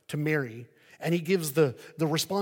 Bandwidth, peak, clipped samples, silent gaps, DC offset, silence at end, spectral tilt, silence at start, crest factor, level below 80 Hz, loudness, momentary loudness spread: 17 kHz; -10 dBFS; under 0.1%; none; under 0.1%; 0 s; -5 dB/octave; 0.1 s; 18 dB; -76 dBFS; -28 LUFS; 10 LU